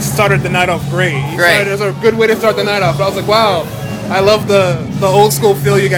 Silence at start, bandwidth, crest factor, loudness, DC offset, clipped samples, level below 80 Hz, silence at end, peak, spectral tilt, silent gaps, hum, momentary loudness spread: 0 s; 20 kHz; 12 dB; -12 LUFS; under 0.1%; 0.5%; -40 dBFS; 0 s; 0 dBFS; -5 dB/octave; none; none; 5 LU